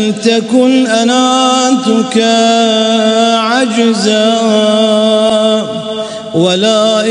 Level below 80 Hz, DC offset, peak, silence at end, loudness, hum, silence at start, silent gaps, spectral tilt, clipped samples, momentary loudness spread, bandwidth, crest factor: -58 dBFS; under 0.1%; 0 dBFS; 0 s; -10 LUFS; none; 0 s; none; -4 dB/octave; under 0.1%; 4 LU; 10.5 kHz; 10 dB